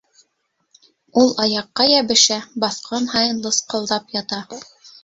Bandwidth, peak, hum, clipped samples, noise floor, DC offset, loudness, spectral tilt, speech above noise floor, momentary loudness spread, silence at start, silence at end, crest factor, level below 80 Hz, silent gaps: 8 kHz; 0 dBFS; none; under 0.1%; -70 dBFS; under 0.1%; -18 LUFS; -2 dB/octave; 51 dB; 12 LU; 1.15 s; 0.15 s; 20 dB; -62 dBFS; none